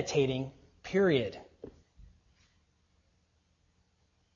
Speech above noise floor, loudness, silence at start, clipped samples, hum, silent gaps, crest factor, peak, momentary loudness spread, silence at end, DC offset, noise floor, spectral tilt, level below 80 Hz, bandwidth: 43 dB; -31 LUFS; 0 s; under 0.1%; none; none; 22 dB; -14 dBFS; 25 LU; 2.35 s; under 0.1%; -73 dBFS; -5.5 dB/octave; -62 dBFS; 7.4 kHz